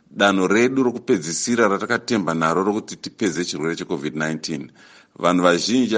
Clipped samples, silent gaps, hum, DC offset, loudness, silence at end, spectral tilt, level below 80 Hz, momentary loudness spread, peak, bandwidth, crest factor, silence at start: under 0.1%; none; none; under 0.1%; -20 LUFS; 0 s; -4 dB/octave; -62 dBFS; 10 LU; 0 dBFS; 10 kHz; 20 dB; 0.15 s